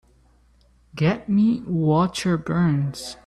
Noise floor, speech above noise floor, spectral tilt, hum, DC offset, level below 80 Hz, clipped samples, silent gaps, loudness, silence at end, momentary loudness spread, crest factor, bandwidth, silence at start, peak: -57 dBFS; 36 dB; -7 dB/octave; none; under 0.1%; -52 dBFS; under 0.1%; none; -22 LUFS; 0.1 s; 5 LU; 12 dB; 13 kHz; 0.95 s; -10 dBFS